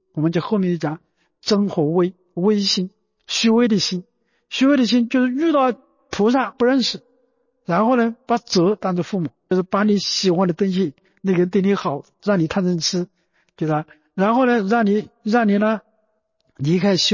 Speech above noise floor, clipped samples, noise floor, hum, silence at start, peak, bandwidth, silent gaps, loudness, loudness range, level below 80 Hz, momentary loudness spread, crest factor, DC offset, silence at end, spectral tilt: 50 dB; under 0.1%; -68 dBFS; none; 0.15 s; -6 dBFS; 7.4 kHz; none; -19 LUFS; 2 LU; -60 dBFS; 10 LU; 14 dB; under 0.1%; 0 s; -5.5 dB/octave